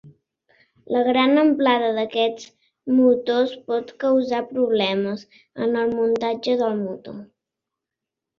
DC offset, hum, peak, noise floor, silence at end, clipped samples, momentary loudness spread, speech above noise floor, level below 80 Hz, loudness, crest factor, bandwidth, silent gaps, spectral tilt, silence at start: under 0.1%; none; -6 dBFS; -85 dBFS; 1.15 s; under 0.1%; 16 LU; 65 dB; -66 dBFS; -21 LUFS; 16 dB; 7 kHz; none; -6 dB/octave; 0.05 s